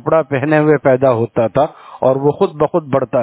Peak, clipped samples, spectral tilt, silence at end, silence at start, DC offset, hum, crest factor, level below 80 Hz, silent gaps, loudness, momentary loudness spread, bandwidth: 0 dBFS; under 0.1%; -11.5 dB/octave; 0 s; 0.05 s; under 0.1%; none; 14 dB; -50 dBFS; none; -15 LUFS; 5 LU; 4 kHz